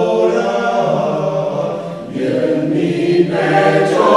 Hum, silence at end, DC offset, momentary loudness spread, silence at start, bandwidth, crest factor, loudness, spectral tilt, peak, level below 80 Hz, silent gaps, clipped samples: none; 0 s; 0.2%; 8 LU; 0 s; 11 kHz; 14 dB; -15 LUFS; -6.5 dB/octave; 0 dBFS; -56 dBFS; none; under 0.1%